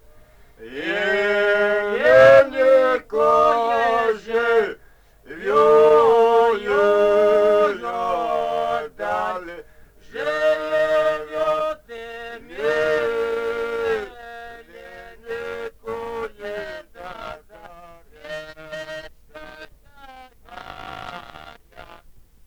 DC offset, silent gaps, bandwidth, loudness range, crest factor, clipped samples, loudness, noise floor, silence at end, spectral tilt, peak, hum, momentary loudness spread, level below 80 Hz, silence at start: under 0.1%; none; 14 kHz; 21 LU; 18 dB; under 0.1%; -19 LUFS; -50 dBFS; 0.5 s; -4.5 dB/octave; -2 dBFS; none; 23 LU; -52 dBFS; 0.6 s